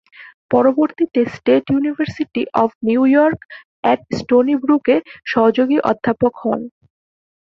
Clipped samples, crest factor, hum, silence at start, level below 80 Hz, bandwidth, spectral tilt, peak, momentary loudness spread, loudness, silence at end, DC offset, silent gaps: under 0.1%; 16 dB; none; 0.2 s; -54 dBFS; 7.2 kHz; -7.5 dB/octave; -2 dBFS; 8 LU; -17 LUFS; 0.8 s; under 0.1%; 0.34-0.49 s, 2.75-2.81 s, 3.45-3.49 s, 3.65-3.83 s